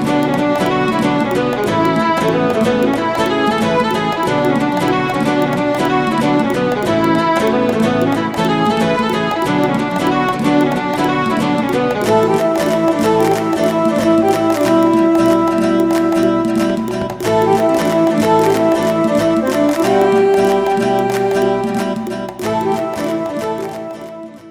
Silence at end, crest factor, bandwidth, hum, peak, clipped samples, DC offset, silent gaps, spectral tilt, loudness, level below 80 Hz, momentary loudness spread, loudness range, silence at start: 0 s; 14 dB; over 20 kHz; none; 0 dBFS; under 0.1%; under 0.1%; none; -6 dB/octave; -15 LUFS; -46 dBFS; 6 LU; 2 LU; 0 s